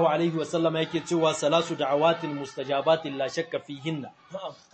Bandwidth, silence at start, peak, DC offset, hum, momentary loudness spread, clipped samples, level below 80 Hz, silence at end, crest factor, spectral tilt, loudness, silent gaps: 8.8 kHz; 0 s; -10 dBFS; under 0.1%; none; 12 LU; under 0.1%; -72 dBFS; 0.2 s; 18 dB; -5 dB/octave; -27 LUFS; none